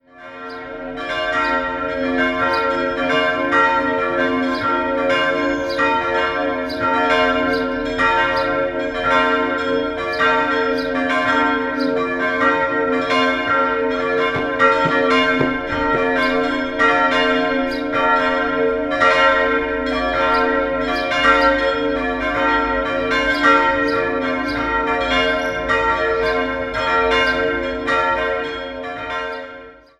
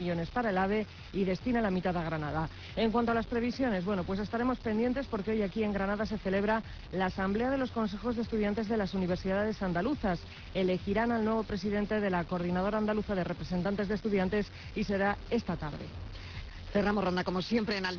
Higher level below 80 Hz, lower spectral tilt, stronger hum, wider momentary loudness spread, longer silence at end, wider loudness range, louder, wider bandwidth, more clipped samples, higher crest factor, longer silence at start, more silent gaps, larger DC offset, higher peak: first, -40 dBFS vs -48 dBFS; about the same, -4.5 dB/octave vs -5.5 dB/octave; neither; about the same, 7 LU vs 6 LU; first, 0.25 s vs 0 s; about the same, 2 LU vs 1 LU; first, -17 LUFS vs -32 LUFS; first, 11.5 kHz vs 5.4 kHz; neither; about the same, 18 dB vs 14 dB; first, 0.15 s vs 0 s; neither; neither; first, 0 dBFS vs -18 dBFS